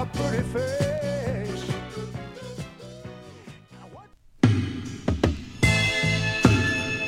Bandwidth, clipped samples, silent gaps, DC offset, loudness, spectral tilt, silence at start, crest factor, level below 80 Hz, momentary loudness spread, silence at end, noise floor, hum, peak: 15 kHz; under 0.1%; none; under 0.1%; -25 LUFS; -5.5 dB/octave; 0 s; 24 dB; -40 dBFS; 21 LU; 0 s; -49 dBFS; none; -2 dBFS